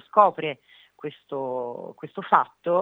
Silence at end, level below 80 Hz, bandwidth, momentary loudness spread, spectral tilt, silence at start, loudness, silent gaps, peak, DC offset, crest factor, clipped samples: 0 s; -84 dBFS; 7.2 kHz; 18 LU; -7.5 dB/octave; 0.15 s; -24 LUFS; none; -2 dBFS; under 0.1%; 22 dB; under 0.1%